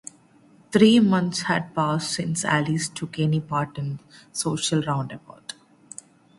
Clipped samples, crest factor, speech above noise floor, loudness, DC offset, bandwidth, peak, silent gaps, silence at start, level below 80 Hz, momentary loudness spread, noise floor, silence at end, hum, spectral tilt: under 0.1%; 20 dB; 32 dB; -23 LUFS; under 0.1%; 11.5 kHz; -4 dBFS; none; 0.7 s; -60 dBFS; 21 LU; -55 dBFS; 0.85 s; none; -5 dB/octave